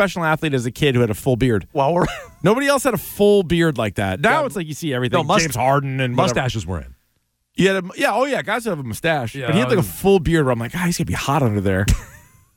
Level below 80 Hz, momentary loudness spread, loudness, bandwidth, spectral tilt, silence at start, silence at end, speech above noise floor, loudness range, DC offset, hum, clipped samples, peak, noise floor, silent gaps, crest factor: -36 dBFS; 6 LU; -19 LUFS; 17 kHz; -5.5 dB/octave; 0 s; 0.4 s; 50 dB; 3 LU; under 0.1%; none; under 0.1%; -4 dBFS; -68 dBFS; none; 14 dB